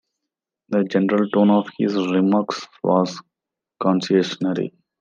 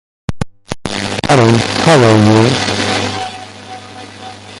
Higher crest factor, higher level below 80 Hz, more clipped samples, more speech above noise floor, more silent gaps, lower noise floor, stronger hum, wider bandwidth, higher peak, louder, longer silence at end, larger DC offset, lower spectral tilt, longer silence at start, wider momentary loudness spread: about the same, 16 dB vs 14 dB; second, -72 dBFS vs -38 dBFS; neither; first, 67 dB vs 22 dB; neither; first, -86 dBFS vs -31 dBFS; neither; second, 7.4 kHz vs 11.5 kHz; second, -4 dBFS vs 0 dBFS; second, -20 LUFS vs -11 LUFS; first, 0.3 s vs 0 s; neither; first, -7 dB/octave vs -5 dB/octave; first, 0.7 s vs 0.3 s; second, 9 LU vs 22 LU